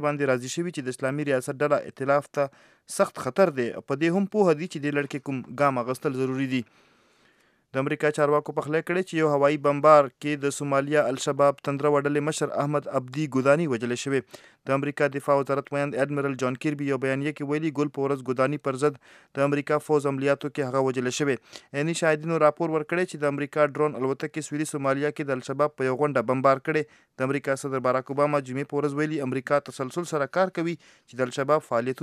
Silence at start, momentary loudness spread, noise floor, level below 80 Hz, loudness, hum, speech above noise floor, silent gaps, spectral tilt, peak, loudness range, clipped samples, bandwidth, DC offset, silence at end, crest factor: 0 s; 8 LU; -64 dBFS; -78 dBFS; -26 LUFS; none; 38 dB; none; -6 dB/octave; -4 dBFS; 4 LU; under 0.1%; 14 kHz; under 0.1%; 0 s; 22 dB